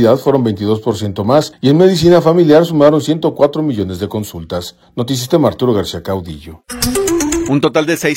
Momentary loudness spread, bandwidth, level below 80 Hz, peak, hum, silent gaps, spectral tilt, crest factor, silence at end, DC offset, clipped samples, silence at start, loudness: 14 LU; 17 kHz; -40 dBFS; 0 dBFS; none; none; -5.5 dB/octave; 12 dB; 0 s; under 0.1%; 0.3%; 0 s; -13 LUFS